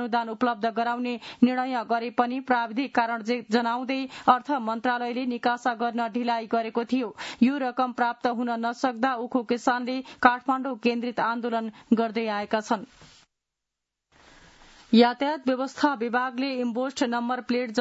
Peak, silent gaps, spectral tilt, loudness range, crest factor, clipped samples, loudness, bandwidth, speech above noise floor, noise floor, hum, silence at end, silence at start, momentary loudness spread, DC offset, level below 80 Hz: -2 dBFS; none; -5 dB/octave; 3 LU; 24 dB; under 0.1%; -26 LUFS; 8 kHz; 59 dB; -85 dBFS; none; 0 s; 0 s; 6 LU; under 0.1%; -70 dBFS